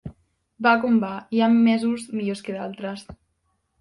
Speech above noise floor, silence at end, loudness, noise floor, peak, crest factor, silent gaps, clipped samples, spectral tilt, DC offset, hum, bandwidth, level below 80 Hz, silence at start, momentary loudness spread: 50 dB; 0.65 s; -22 LUFS; -72 dBFS; -6 dBFS; 18 dB; none; under 0.1%; -6 dB/octave; under 0.1%; none; 11 kHz; -58 dBFS; 0.05 s; 15 LU